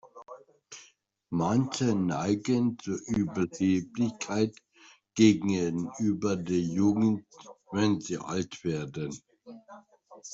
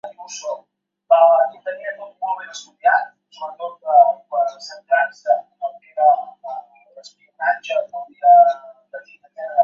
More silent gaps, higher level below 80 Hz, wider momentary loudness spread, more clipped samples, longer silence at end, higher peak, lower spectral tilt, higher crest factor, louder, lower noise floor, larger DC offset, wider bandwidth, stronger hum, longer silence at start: neither; first, -64 dBFS vs -82 dBFS; about the same, 23 LU vs 21 LU; neither; about the same, 0 s vs 0 s; second, -8 dBFS vs -2 dBFS; first, -6 dB/octave vs -0.5 dB/octave; about the same, 20 dB vs 18 dB; second, -29 LUFS vs -18 LUFS; first, -62 dBFS vs -45 dBFS; neither; about the same, 8 kHz vs 7.4 kHz; neither; about the same, 0.05 s vs 0.05 s